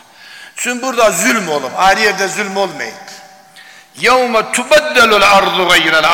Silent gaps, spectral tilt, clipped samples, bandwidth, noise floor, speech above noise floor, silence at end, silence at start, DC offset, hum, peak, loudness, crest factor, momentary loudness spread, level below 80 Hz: none; -2 dB/octave; under 0.1%; 17 kHz; -39 dBFS; 28 dB; 0 s; 0.25 s; under 0.1%; none; -2 dBFS; -11 LUFS; 10 dB; 12 LU; -46 dBFS